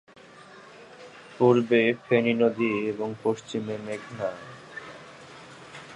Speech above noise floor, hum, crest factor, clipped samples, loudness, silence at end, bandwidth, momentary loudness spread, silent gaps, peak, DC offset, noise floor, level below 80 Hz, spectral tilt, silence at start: 25 dB; none; 20 dB; under 0.1%; -25 LUFS; 0 s; 10.5 kHz; 24 LU; none; -8 dBFS; under 0.1%; -50 dBFS; -70 dBFS; -6.5 dB/octave; 0.4 s